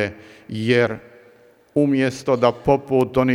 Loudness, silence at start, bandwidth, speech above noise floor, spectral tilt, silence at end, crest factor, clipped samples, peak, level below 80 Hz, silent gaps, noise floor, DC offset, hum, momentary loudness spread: -20 LUFS; 0 s; 13.5 kHz; 33 dB; -6.5 dB/octave; 0 s; 18 dB; under 0.1%; -2 dBFS; -50 dBFS; none; -52 dBFS; under 0.1%; none; 9 LU